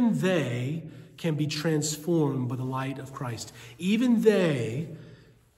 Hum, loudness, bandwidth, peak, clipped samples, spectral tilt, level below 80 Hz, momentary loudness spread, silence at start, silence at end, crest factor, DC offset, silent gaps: none; -27 LUFS; 16 kHz; -8 dBFS; under 0.1%; -6 dB/octave; -66 dBFS; 15 LU; 0 s; 0.45 s; 18 dB; under 0.1%; none